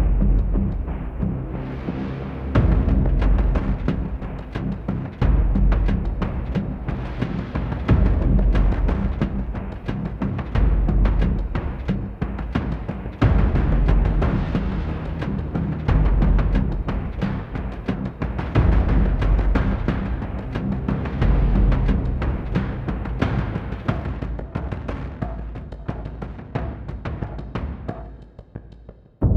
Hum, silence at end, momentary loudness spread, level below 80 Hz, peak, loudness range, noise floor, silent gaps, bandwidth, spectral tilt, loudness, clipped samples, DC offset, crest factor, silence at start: none; 0 s; 11 LU; -22 dBFS; -4 dBFS; 7 LU; -44 dBFS; none; 5 kHz; -9.5 dB/octave; -24 LUFS; under 0.1%; under 0.1%; 16 dB; 0 s